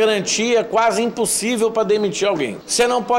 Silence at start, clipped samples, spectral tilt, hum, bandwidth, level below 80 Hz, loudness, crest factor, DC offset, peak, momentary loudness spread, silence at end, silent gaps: 0 s; under 0.1%; -2.5 dB/octave; none; 16.5 kHz; -56 dBFS; -18 LUFS; 10 dB; under 0.1%; -8 dBFS; 3 LU; 0 s; none